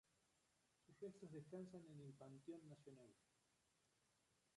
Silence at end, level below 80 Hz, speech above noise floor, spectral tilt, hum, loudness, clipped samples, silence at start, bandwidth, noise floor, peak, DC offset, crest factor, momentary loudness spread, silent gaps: 0.2 s; under -90 dBFS; 25 dB; -7 dB/octave; none; -60 LUFS; under 0.1%; 0.15 s; 11 kHz; -85 dBFS; -44 dBFS; under 0.1%; 18 dB; 8 LU; none